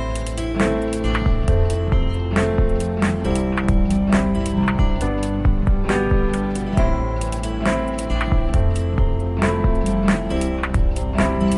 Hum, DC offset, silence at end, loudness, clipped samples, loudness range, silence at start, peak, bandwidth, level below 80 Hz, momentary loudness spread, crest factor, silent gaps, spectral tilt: none; under 0.1%; 0 s; -20 LUFS; under 0.1%; 1 LU; 0 s; -6 dBFS; 11.5 kHz; -22 dBFS; 4 LU; 12 dB; none; -7 dB/octave